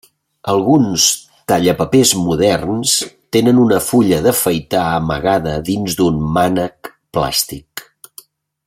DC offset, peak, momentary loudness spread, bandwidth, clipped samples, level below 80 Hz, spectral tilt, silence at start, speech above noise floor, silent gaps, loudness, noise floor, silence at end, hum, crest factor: under 0.1%; 0 dBFS; 10 LU; 16.5 kHz; under 0.1%; -42 dBFS; -4 dB/octave; 0.45 s; 29 dB; none; -14 LUFS; -43 dBFS; 0.85 s; none; 16 dB